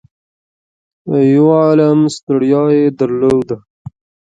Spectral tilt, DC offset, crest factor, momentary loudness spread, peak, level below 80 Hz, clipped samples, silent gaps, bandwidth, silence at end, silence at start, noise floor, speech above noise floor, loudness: -8 dB/octave; under 0.1%; 12 dB; 10 LU; 0 dBFS; -52 dBFS; under 0.1%; 2.23-2.27 s; 9.2 kHz; 0.75 s; 1.05 s; under -90 dBFS; over 79 dB; -12 LUFS